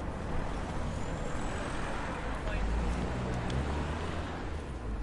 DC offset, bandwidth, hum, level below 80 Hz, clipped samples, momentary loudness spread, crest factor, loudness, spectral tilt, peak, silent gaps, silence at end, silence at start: under 0.1%; 11.5 kHz; none; -38 dBFS; under 0.1%; 4 LU; 14 dB; -36 LUFS; -6 dB/octave; -20 dBFS; none; 0 s; 0 s